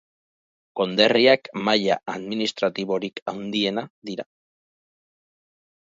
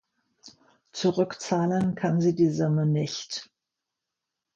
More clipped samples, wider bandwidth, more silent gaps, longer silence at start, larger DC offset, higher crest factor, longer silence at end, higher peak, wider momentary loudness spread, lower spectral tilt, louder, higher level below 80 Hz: neither; about the same, 7.8 kHz vs 7.8 kHz; first, 3.22-3.26 s, 3.90-4.02 s vs none; first, 0.75 s vs 0.45 s; neither; first, 22 dB vs 16 dB; first, 1.6 s vs 1.1 s; first, -2 dBFS vs -10 dBFS; first, 17 LU vs 11 LU; second, -4.5 dB/octave vs -6.5 dB/octave; first, -22 LUFS vs -26 LUFS; second, -70 dBFS vs -64 dBFS